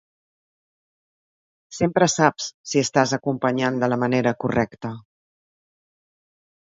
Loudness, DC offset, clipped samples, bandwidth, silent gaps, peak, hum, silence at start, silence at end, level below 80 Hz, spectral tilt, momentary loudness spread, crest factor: -21 LUFS; under 0.1%; under 0.1%; 8 kHz; 2.54-2.64 s; -2 dBFS; none; 1.7 s; 1.65 s; -58 dBFS; -4.5 dB/octave; 14 LU; 22 dB